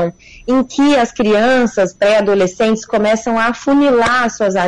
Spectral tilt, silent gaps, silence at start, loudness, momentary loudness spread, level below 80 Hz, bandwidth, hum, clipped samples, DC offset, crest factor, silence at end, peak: -4.5 dB/octave; none; 0 s; -13 LUFS; 5 LU; -44 dBFS; 10.5 kHz; none; under 0.1%; under 0.1%; 8 dB; 0 s; -6 dBFS